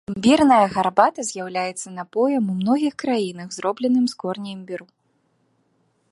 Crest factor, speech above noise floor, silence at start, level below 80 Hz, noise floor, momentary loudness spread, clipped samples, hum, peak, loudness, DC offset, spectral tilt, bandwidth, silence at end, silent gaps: 20 dB; 46 dB; 0.1 s; -60 dBFS; -66 dBFS; 15 LU; under 0.1%; none; -2 dBFS; -21 LUFS; under 0.1%; -5 dB/octave; 11.5 kHz; 1.3 s; none